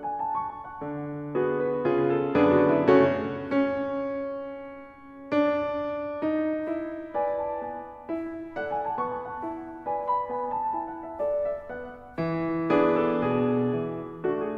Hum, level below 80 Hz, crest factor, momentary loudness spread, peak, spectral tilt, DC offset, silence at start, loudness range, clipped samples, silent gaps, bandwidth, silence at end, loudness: none; -60 dBFS; 20 dB; 14 LU; -8 dBFS; -9 dB/octave; under 0.1%; 0 s; 7 LU; under 0.1%; none; 6.4 kHz; 0 s; -27 LUFS